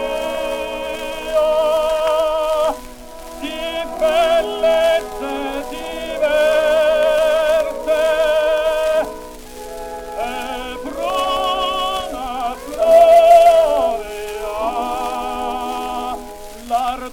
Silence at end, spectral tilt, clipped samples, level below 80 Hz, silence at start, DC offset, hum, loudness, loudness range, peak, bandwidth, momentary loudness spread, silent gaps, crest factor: 0 s; -2.5 dB/octave; under 0.1%; -40 dBFS; 0 s; under 0.1%; none; -17 LUFS; 8 LU; 0 dBFS; 17 kHz; 14 LU; none; 16 dB